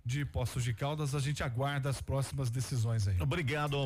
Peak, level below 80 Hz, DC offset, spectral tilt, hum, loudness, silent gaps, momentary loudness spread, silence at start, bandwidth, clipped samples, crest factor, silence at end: -24 dBFS; -50 dBFS; under 0.1%; -5.5 dB/octave; none; -34 LUFS; none; 3 LU; 0.05 s; 15.5 kHz; under 0.1%; 8 dB; 0 s